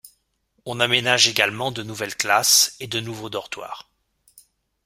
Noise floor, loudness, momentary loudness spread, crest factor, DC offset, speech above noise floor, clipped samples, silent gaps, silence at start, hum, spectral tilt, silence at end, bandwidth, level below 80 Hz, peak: -69 dBFS; -19 LUFS; 18 LU; 24 dB; under 0.1%; 47 dB; under 0.1%; none; 0.05 s; none; -1 dB/octave; 0.45 s; 16 kHz; -62 dBFS; 0 dBFS